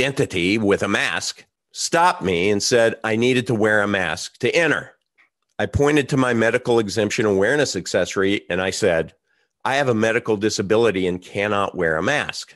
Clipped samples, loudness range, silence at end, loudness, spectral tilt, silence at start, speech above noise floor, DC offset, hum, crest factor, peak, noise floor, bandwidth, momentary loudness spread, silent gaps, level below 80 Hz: under 0.1%; 2 LU; 0.1 s; -20 LUFS; -4.5 dB/octave; 0 s; 43 dB; under 0.1%; none; 18 dB; -2 dBFS; -62 dBFS; 12.5 kHz; 7 LU; none; -48 dBFS